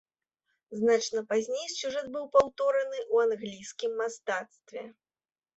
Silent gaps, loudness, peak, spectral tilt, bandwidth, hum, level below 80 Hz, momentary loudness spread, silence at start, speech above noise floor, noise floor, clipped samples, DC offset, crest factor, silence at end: none; -29 LUFS; -10 dBFS; -3 dB/octave; 8.2 kHz; none; -68 dBFS; 18 LU; 0.7 s; over 61 dB; under -90 dBFS; under 0.1%; under 0.1%; 20 dB; 0.65 s